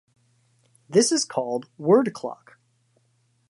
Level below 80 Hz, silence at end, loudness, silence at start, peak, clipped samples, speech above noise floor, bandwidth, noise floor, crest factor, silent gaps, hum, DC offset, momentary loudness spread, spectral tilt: -78 dBFS; 1.15 s; -23 LUFS; 0.9 s; -6 dBFS; under 0.1%; 45 dB; 11.5 kHz; -67 dBFS; 20 dB; none; none; under 0.1%; 16 LU; -4 dB/octave